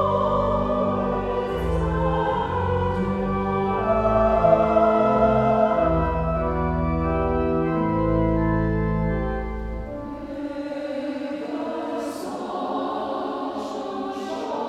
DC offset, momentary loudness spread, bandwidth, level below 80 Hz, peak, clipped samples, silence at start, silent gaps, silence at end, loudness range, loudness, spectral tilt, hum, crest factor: under 0.1%; 11 LU; 12.5 kHz; -34 dBFS; -4 dBFS; under 0.1%; 0 s; none; 0 s; 9 LU; -23 LUFS; -8.5 dB/octave; none; 18 dB